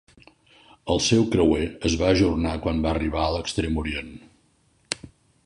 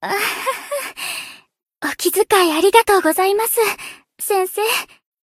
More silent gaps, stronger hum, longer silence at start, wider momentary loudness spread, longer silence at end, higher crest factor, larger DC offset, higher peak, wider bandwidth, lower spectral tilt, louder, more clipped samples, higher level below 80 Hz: neither; neither; first, 0.85 s vs 0 s; about the same, 13 LU vs 15 LU; about the same, 0.4 s vs 0.4 s; about the same, 20 dB vs 18 dB; neither; second, -4 dBFS vs 0 dBFS; second, 11 kHz vs 16.5 kHz; first, -5 dB/octave vs -1 dB/octave; second, -23 LUFS vs -17 LUFS; neither; first, -36 dBFS vs -58 dBFS